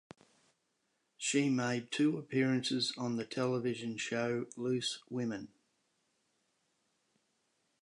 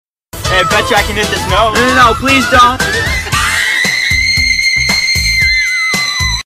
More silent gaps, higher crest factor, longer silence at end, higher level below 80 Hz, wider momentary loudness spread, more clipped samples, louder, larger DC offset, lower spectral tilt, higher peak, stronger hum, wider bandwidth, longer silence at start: neither; first, 18 dB vs 10 dB; first, 2.35 s vs 0.05 s; second, -80 dBFS vs -26 dBFS; about the same, 7 LU vs 5 LU; neither; second, -35 LUFS vs -9 LUFS; second, under 0.1% vs 0.3%; first, -4.5 dB/octave vs -2.5 dB/octave; second, -18 dBFS vs 0 dBFS; neither; second, 11 kHz vs 15.5 kHz; first, 1.2 s vs 0.35 s